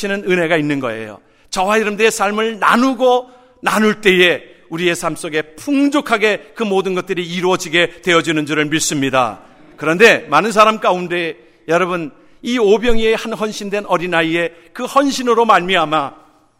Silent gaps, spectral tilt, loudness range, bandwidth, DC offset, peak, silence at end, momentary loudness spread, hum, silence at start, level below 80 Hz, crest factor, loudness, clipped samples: none; -4 dB/octave; 3 LU; 16 kHz; under 0.1%; 0 dBFS; 0.45 s; 10 LU; none; 0 s; -38 dBFS; 16 dB; -15 LUFS; under 0.1%